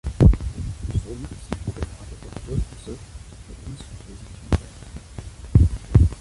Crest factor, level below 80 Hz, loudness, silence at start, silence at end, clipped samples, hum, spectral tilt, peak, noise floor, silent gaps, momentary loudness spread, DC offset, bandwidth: 20 dB; -26 dBFS; -23 LUFS; 0.05 s; 0 s; under 0.1%; none; -8 dB/octave; -4 dBFS; -40 dBFS; none; 21 LU; under 0.1%; 11.5 kHz